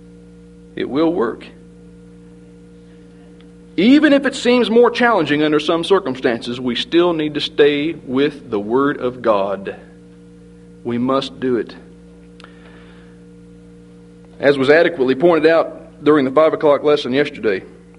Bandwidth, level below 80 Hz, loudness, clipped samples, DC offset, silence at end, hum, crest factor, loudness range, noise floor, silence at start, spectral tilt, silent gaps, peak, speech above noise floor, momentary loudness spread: 11 kHz; -52 dBFS; -16 LUFS; under 0.1%; under 0.1%; 0.3 s; none; 18 dB; 10 LU; -42 dBFS; 0.75 s; -6 dB/octave; none; 0 dBFS; 26 dB; 12 LU